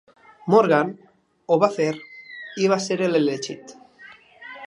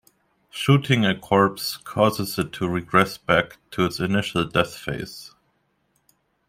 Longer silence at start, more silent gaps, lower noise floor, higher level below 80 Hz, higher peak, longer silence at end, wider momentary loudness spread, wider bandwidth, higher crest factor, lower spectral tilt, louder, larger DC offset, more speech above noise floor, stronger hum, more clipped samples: about the same, 0.45 s vs 0.55 s; neither; second, -48 dBFS vs -69 dBFS; second, -74 dBFS vs -52 dBFS; about the same, -2 dBFS vs -2 dBFS; second, 0 s vs 1.2 s; first, 21 LU vs 11 LU; second, 11 kHz vs 16 kHz; about the same, 20 dB vs 20 dB; about the same, -5.5 dB/octave vs -5.5 dB/octave; about the same, -21 LUFS vs -22 LUFS; neither; second, 28 dB vs 47 dB; neither; neither